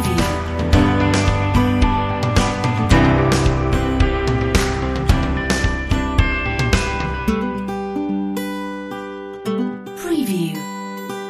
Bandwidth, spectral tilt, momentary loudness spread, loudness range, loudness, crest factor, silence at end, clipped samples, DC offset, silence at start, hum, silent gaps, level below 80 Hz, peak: 15.5 kHz; -6 dB/octave; 11 LU; 7 LU; -19 LUFS; 16 dB; 0 s; under 0.1%; under 0.1%; 0 s; none; none; -24 dBFS; -2 dBFS